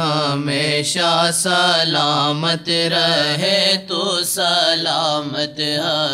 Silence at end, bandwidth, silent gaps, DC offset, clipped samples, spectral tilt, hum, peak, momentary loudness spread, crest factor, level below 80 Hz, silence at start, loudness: 0 s; 16 kHz; none; under 0.1%; under 0.1%; -3 dB/octave; none; -2 dBFS; 5 LU; 16 dB; -64 dBFS; 0 s; -16 LUFS